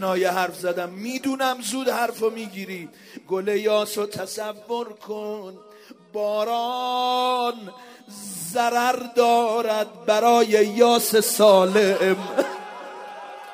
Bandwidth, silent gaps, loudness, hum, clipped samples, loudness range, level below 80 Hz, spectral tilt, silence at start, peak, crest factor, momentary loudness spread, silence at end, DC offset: 16 kHz; none; -22 LUFS; none; under 0.1%; 9 LU; -76 dBFS; -3.5 dB/octave; 0 s; -4 dBFS; 20 dB; 19 LU; 0 s; under 0.1%